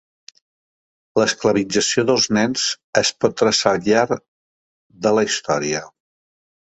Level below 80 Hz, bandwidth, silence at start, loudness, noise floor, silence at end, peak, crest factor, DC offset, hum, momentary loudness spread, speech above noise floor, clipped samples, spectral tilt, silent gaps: -58 dBFS; 8.2 kHz; 1.15 s; -18 LUFS; under -90 dBFS; 0.85 s; 0 dBFS; 20 dB; under 0.1%; none; 7 LU; over 72 dB; under 0.1%; -3 dB/octave; 2.84-2.93 s, 4.28-4.90 s